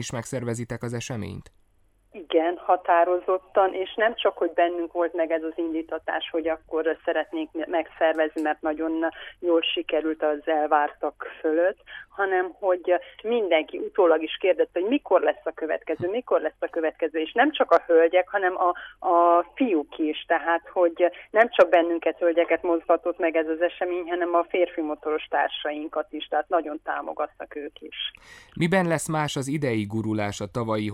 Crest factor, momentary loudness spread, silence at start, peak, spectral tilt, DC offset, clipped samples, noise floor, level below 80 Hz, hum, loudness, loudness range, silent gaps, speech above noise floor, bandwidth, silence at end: 18 dB; 10 LU; 0 s; -6 dBFS; -5.5 dB/octave; under 0.1%; under 0.1%; -62 dBFS; -62 dBFS; none; -25 LUFS; 5 LU; none; 38 dB; 13 kHz; 0 s